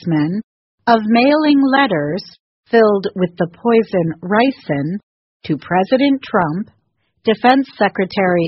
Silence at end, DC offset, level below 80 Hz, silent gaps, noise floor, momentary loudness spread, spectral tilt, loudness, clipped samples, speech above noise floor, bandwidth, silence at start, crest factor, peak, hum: 0 s; under 0.1%; -56 dBFS; 0.44-0.78 s, 2.40-2.63 s, 5.03-5.40 s; -53 dBFS; 12 LU; -4.5 dB/octave; -16 LUFS; under 0.1%; 38 dB; 6 kHz; 0 s; 16 dB; 0 dBFS; none